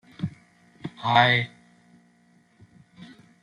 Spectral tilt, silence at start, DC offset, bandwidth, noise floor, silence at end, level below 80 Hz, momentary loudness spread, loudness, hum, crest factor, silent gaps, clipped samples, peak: -6 dB/octave; 0.2 s; under 0.1%; 10.5 kHz; -61 dBFS; 0.35 s; -64 dBFS; 22 LU; -23 LUFS; none; 24 dB; none; under 0.1%; -6 dBFS